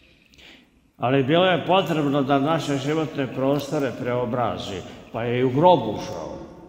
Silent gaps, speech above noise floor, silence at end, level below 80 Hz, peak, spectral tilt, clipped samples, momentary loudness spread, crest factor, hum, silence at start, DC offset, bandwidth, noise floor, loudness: none; 31 dB; 0 s; -56 dBFS; -4 dBFS; -6.5 dB/octave; under 0.1%; 14 LU; 18 dB; none; 0.5 s; under 0.1%; 16 kHz; -53 dBFS; -22 LUFS